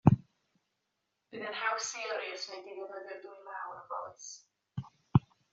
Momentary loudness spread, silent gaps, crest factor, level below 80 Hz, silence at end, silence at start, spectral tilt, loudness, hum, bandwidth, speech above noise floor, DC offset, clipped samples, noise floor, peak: 16 LU; none; 28 dB; -60 dBFS; 0.35 s; 0.05 s; -6 dB/octave; -36 LUFS; none; 7.8 kHz; 43 dB; under 0.1%; under 0.1%; -83 dBFS; -8 dBFS